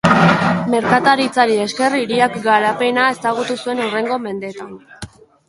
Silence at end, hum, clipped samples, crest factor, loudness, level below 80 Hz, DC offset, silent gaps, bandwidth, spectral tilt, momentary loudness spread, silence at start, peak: 0.4 s; none; under 0.1%; 16 dB; -16 LUFS; -52 dBFS; under 0.1%; none; 11.5 kHz; -5.5 dB/octave; 20 LU; 0.05 s; 0 dBFS